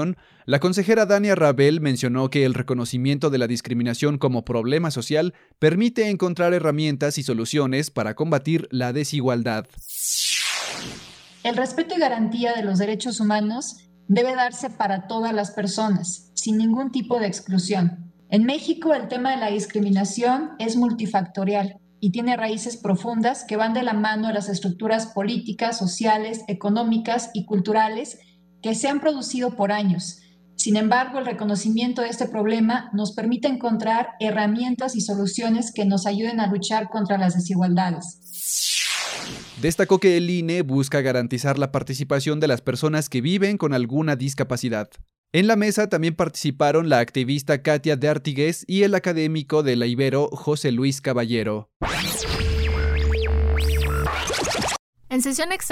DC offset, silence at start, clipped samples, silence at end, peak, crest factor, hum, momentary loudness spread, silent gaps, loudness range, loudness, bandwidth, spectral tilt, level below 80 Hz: under 0.1%; 0 s; under 0.1%; 0 s; -4 dBFS; 16 dB; none; 7 LU; 45.18-45.24 s, 51.76-51.80 s, 54.79-54.93 s; 3 LU; -22 LUFS; 16 kHz; -5 dB/octave; -38 dBFS